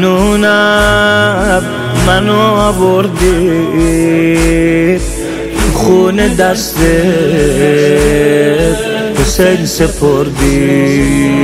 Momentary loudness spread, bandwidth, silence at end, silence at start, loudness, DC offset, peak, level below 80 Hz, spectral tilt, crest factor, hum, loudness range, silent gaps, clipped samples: 4 LU; 16.5 kHz; 0 s; 0 s; -10 LUFS; under 0.1%; 0 dBFS; -22 dBFS; -5 dB/octave; 10 dB; none; 1 LU; none; 1%